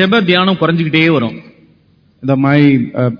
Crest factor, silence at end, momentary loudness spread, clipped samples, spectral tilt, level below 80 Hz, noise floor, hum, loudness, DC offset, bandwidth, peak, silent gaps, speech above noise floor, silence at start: 12 dB; 0 s; 11 LU; 0.2%; -8.5 dB/octave; -52 dBFS; -51 dBFS; none; -12 LUFS; under 0.1%; 5.4 kHz; 0 dBFS; none; 39 dB; 0 s